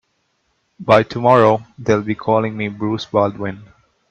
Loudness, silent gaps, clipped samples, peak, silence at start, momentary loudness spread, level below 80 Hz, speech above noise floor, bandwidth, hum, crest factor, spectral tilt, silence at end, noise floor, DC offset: -17 LUFS; none; under 0.1%; 0 dBFS; 0.8 s; 15 LU; -54 dBFS; 50 dB; 8.4 kHz; none; 18 dB; -7 dB/octave; 0.45 s; -66 dBFS; under 0.1%